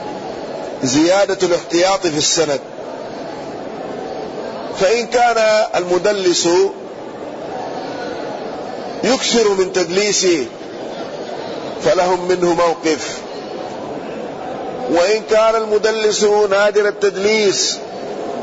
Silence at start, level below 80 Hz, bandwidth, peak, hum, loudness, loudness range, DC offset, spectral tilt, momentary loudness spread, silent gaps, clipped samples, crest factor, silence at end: 0 s; -52 dBFS; 8 kHz; -4 dBFS; none; -17 LUFS; 4 LU; under 0.1%; -3 dB/octave; 14 LU; none; under 0.1%; 14 dB; 0 s